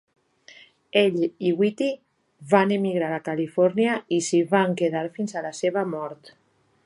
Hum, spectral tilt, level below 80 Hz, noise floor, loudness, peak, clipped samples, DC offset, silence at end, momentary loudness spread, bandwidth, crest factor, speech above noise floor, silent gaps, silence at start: none; -5.5 dB/octave; -74 dBFS; -51 dBFS; -23 LUFS; -4 dBFS; under 0.1%; under 0.1%; 0.55 s; 9 LU; 11.5 kHz; 20 dB; 29 dB; none; 0.95 s